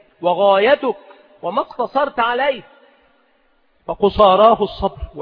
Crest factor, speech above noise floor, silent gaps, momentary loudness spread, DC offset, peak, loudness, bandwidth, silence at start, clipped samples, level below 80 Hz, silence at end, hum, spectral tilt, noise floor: 18 dB; 43 dB; none; 17 LU; under 0.1%; 0 dBFS; -16 LUFS; 5.2 kHz; 0.2 s; under 0.1%; -42 dBFS; 0 s; none; -8 dB/octave; -59 dBFS